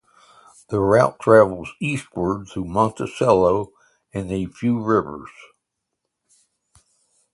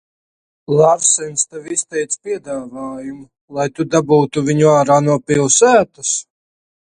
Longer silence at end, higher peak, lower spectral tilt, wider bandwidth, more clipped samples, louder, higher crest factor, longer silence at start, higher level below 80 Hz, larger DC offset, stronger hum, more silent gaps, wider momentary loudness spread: first, 2.05 s vs 0.65 s; about the same, 0 dBFS vs 0 dBFS; first, -7 dB/octave vs -4 dB/octave; about the same, 11.5 kHz vs 10.5 kHz; neither; second, -20 LUFS vs -15 LUFS; about the same, 20 dB vs 16 dB; about the same, 0.7 s vs 0.7 s; first, -48 dBFS vs -56 dBFS; neither; neither; second, none vs 3.41-3.48 s; about the same, 14 LU vs 16 LU